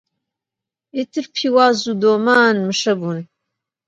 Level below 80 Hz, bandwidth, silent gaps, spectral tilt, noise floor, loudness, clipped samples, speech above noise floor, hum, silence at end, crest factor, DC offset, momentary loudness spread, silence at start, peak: -68 dBFS; 9.2 kHz; none; -4.5 dB/octave; -86 dBFS; -16 LUFS; under 0.1%; 70 dB; none; 0.65 s; 18 dB; under 0.1%; 13 LU; 0.95 s; 0 dBFS